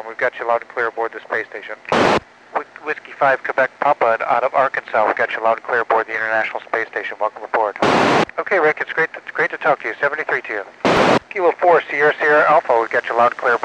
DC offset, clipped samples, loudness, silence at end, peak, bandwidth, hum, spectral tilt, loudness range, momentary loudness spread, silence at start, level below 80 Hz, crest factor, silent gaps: under 0.1%; under 0.1%; -18 LUFS; 0 s; -2 dBFS; 10.5 kHz; none; -4.5 dB/octave; 4 LU; 10 LU; 0 s; -54 dBFS; 16 dB; none